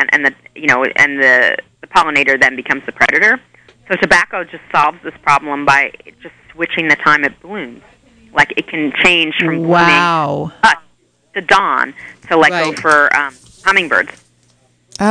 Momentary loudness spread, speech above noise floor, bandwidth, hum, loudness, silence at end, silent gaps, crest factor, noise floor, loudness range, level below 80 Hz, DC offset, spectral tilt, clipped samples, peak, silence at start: 11 LU; 41 dB; 10 kHz; none; -12 LUFS; 0 s; none; 14 dB; -54 dBFS; 3 LU; -48 dBFS; under 0.1%; -4 dB/octave; under 0.1%; 0 dBFS; 0 s